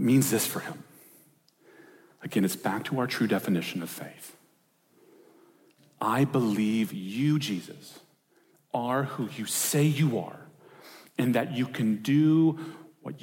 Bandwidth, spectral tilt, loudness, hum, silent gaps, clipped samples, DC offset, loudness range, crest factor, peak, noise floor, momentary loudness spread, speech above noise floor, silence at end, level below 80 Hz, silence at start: 17 kHz; -5.5 dB/octave; -27 LUFS; none; none; under 0.1%; under 0.1%; 5 LU; 16 dB; -12 dBFS; -67 dBFS; 20 LU; 40 dB; 0.05 s; -78 dBFS; 0 s